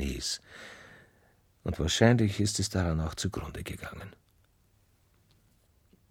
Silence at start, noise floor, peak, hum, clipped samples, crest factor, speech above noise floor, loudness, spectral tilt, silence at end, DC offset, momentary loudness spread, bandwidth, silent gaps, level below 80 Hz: 0 s; -67 dBFS; -8 dBFS; none; under 0.1%; 26 dB; 38 dB; -30 LUFS; -5 dB/octave; 2 s; under 0.1%; 23 LU; 16.5 kHz; none; -46 dBFS